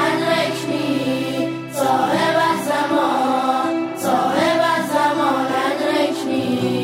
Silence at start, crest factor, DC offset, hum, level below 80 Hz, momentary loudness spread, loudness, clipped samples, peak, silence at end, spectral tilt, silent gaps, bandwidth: 0 s; 14 dB; under 0.1%; none; -64 dBFS; 5 LU; -19 LUFS; under 0.1%; -6 dBFS; 0 s; -4.5 dB/octave; none; 16 kHz